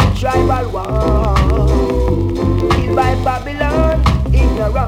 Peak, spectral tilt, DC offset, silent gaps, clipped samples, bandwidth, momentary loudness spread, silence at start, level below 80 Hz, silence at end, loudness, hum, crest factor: -2 dBFS; -7.5 dB/octave; under 0.1%; none; under 0.1%; 12 kHz; 4 LU; 0 s; -18 dBFS; 0 s; -15 LUFS; none; 10 dB